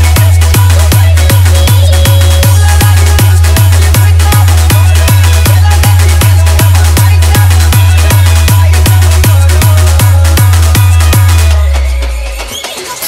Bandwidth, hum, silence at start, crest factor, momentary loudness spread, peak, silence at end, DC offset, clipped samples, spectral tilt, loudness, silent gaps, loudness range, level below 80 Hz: 16.5 kHz; none; 0 s; 4 dB; 2 LU; 0 dBFS; 0 s; under 0.1%; 2%; -4.5 dB/octave; -6 LUFS; none; 1 LU; -10 dBFS